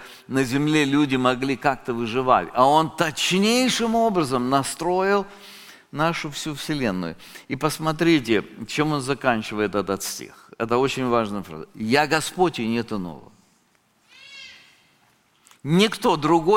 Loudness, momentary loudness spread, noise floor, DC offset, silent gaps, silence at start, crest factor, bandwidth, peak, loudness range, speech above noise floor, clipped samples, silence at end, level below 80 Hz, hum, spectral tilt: -22 LUFS; 17 LU; -63 dBFS; under 0.1%; none; 0 s; 20 dB; 17 kHz; -2 dBFS; 6 LU; 41 dB; under 0.1%; 0 s; -52 dBFS; none; -4.5 dB/octave